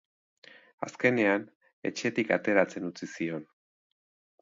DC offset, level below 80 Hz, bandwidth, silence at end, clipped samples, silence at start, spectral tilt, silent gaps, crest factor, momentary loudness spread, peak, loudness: under 0.1%; -78 dBFS; 7.8 kHz; 1 s; under 0.1%; 0.8 s; -5.5 dB/octave; 1.55-1.61 s, 1.73-1.82 s; 22 dB; 14 LU; -10 dBFS; -29 LUFS